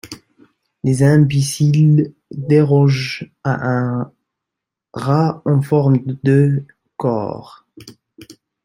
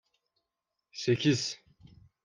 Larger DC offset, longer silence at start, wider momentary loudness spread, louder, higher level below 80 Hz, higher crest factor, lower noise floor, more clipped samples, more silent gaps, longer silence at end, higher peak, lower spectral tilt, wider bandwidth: neither; second, 0.05 s vs 0.95 s; second, 16 LU vs 19 LU; first, -16 LUFS vs -30 LUFS; first, -54 dBFS vs -72 dBFS; second, 14 dB vs 20 dB; about the same, -83 dBFS vs -86 dBFS; neither; neither; second, 0.35 s vs 0.7 s; first, -2 dBFS vs -14 dBFS; first, -7.5 dB/octave vs -5 dB/octave; first, 12.5 kHz vs 10 kHz